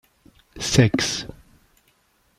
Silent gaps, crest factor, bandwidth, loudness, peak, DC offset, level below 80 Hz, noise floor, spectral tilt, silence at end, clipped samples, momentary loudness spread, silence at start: none; 24 dB; 14.5 kHz; -21 LUFS; 0 dBFS; under 0.1%; -46 dBFS; -63 dBFS; -4.5 dB/octave; 1.05 s; under 0.1%; 13 LU; 0.55 s